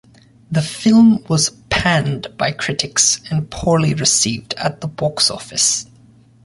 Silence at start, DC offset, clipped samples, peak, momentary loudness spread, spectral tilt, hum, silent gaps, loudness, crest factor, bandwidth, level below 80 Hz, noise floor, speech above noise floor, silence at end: 0.5 s; under 0.1%; under 0.1%; 0 dBFS; 10 LU; -3.5 dB/octave; none; none; -16 LUFS; 16 dB; 11.5 kHz; -42 dBFS; -48 dBFS; 31 dB; 0.6 s